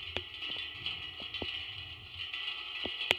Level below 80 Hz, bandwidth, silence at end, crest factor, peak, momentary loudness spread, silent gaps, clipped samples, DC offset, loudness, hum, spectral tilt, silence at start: -60 dBFS; over 20 kHz; 0 s; 32 dB; -6 dBFS; 5 LU; none; under 0.1%; under 0.1%; -38 LUFS; none; -2.5 dB/octave; 0 s